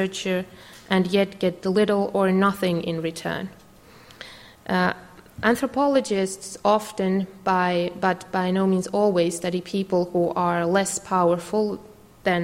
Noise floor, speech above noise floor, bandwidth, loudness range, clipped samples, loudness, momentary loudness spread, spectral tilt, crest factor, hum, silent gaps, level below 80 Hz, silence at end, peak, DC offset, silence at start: -49 dBFS; 26 dB; 16 kHz; 3 LU; under 0.1%; -23 LUFS; 8 LU; -5.5 dB/octave; 18 dB; none; none; -58 dBFS; 0 s; -6 dBFS; under 0.1%; 0 s